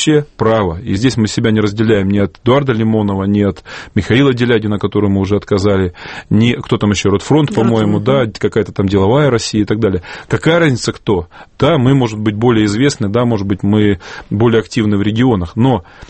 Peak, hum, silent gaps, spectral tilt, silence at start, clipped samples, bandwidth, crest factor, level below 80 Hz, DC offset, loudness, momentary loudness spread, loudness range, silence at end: 0 dBFS; none; none; -6.5 dB/octave; 0 s; under 0.1%; 8.8 kHz; 12 dB; -38 dBFS; under 0.1%; -13 LUFS; 5 LU; 1 LU; 0.05 s